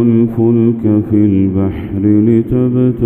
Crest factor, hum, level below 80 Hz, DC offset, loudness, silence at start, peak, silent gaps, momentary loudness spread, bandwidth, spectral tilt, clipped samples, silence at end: 10 dB; none; -36 dBFS; under 0.1%; -12 LUFS; 0 s; 0 dBFS; none; 4 LU; 3.5 kHz; -12 dB/octave; under 0.1%; 0 s